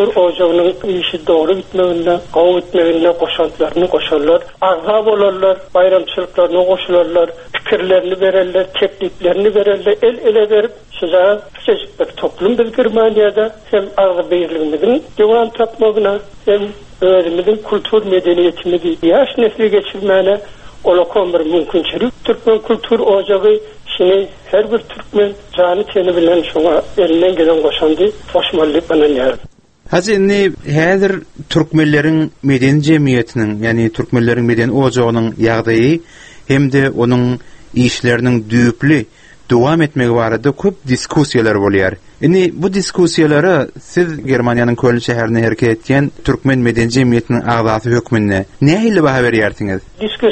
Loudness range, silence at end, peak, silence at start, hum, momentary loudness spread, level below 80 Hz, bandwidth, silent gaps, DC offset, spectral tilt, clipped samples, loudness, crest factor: 1 LU; 0 s; 0 dBFS; 0 s; none; 5 LU; -42 dBFS; 8.8 kHz; none; under 0.1%; -6.5 dB/octave; under 0.1%; -13 LUFS; 12 dB